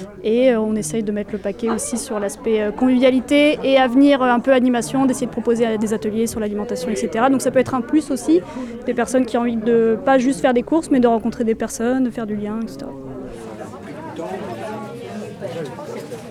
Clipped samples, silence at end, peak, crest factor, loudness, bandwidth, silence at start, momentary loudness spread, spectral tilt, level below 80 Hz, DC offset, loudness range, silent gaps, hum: under 0.1%; 0 s; -4 dBFS; 14 dB; -18 LUFS; 14 kHz; 0 s; 16 LU; -5 dB/octave; -48 dBFS; under 0.1%; 11 LU; none; none